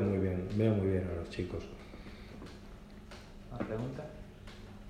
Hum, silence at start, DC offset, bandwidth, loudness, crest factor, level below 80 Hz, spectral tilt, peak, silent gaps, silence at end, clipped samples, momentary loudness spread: none; 0 s; under 0.1%; 10 kHz; -35 LUFS; 20 dB; -52 dBFS; -8.5 dB/octave; -16 dBFS; none; 0 s; under 0.1%; 20 LU